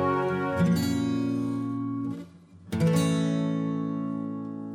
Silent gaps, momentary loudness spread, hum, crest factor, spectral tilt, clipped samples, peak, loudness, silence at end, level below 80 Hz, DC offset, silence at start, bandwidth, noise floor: none; 11 LU; none; 14 dB; -7 dB/octave; under 0.1%; -12 dBFS; -28 LUFS; 0 s; -60 dBFS; under 0.1%; 0 s; 15.5 kHz; -48 dBFS